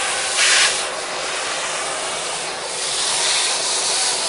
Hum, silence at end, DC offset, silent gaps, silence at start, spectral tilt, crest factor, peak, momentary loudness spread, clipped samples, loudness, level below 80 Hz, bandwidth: none; 0 s; under 0.1%; none; 0 s; 1.5 dB/octave; 20 dB; 0 dBFS; 10 LU; under 0.1%; -18 LUFS; -58 dBFS; 11 kHz